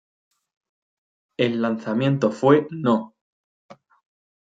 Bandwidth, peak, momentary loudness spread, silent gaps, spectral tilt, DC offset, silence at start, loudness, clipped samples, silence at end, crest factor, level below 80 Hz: 7.8 kHz; -2 dBFS; 7 LU; 3.21-3.69 s; -7.5 dB/octave; under 0.1%; 1.4 s; -21 LUFS; under 0.1%; 0.7 s; 22 dB; -70 dBFS